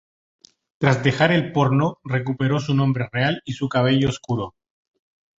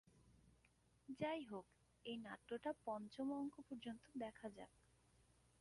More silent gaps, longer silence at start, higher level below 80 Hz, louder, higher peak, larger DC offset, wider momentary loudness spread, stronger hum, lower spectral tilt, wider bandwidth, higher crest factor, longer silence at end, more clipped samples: neither; first, 0.8 s vs 0.15 s; first, -52 dBFS vs -80 dBFS; first, -21 LUFS vs -51 LUFS; first, -2 dBFS vs -34 dBFS; neither; second, 8 LU vs 12 LU; neither; about the same, -6.5 dB/octave vs -6 dB/octave; second, 7.8 kHz vs 11.5 kHz; about the same, 20 dB vs 18 dB; about the same, 0.9 s vs 0.9 s; neither